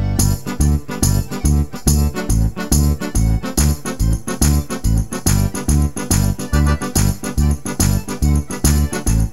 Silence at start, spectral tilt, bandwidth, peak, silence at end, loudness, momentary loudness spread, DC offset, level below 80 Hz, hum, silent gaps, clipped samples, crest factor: 0 s; -5 dB/octave; 16.5 kHz; 0 dBFS; 0 s; -18 LUFS; 3 LU; 3%; -20 dBFS; none; none; under 0.1%; 16 dB